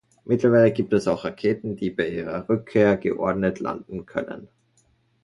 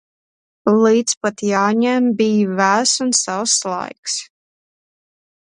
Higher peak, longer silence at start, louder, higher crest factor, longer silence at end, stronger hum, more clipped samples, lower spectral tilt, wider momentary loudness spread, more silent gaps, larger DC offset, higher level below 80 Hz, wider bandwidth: second, -4 dBFS vs 0 dBFS; second, 0.25 s vs 0.65 s; second, -23 LUFS vs -17 LUFS; about the same, 18 dB vs 18 dB; second, 0.8 s vs 1.35 s; neither; neither; first, -7.5 dB/octave vs -3 dB/octave; about the same, 12 LU vs 10 LU; second, none vs 1.17-1.21 s, 3.98-4.03 s; neither; first, -54 dBFS vs -68 dBFS; about the same, 11.5 kHz vs 11.5 kHz